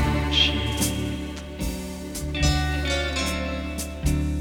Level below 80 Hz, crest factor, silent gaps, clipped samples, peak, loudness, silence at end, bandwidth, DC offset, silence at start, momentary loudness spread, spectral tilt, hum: -30 dBFS; 18 dB; none; under 0.1%; -8 dBFS; -25 LUFS; 0 s; 19 kHz; under 0.1%; 0 s; 12 LU; -4 dB/octave; none